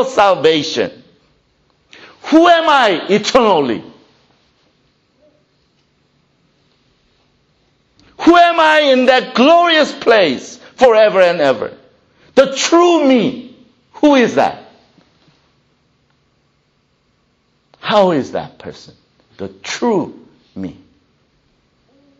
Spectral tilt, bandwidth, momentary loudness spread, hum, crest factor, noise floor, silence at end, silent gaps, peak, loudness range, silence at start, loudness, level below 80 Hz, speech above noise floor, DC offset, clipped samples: -4 dB/octave; 8.6 kHz; 20 LU; none; 16 dB; -60 dBFS; 1.45 s; none; 0 dBFS; 12 LU; 0 s; -12 LUFS; -54 dBFS; 48 dB; under 0.1%; under 0.1%